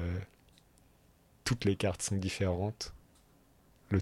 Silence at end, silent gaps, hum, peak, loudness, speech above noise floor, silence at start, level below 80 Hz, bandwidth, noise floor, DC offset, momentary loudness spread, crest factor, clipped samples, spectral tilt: 0 s; none; none; -18 dBFS; -35 LUFS; 32 dB; 0 s; -56 dBFS; 15.5 kHz; -65 dBFS; under 0.1%; 11 LU; 18 dB; under 0.1%; -5 dB/octave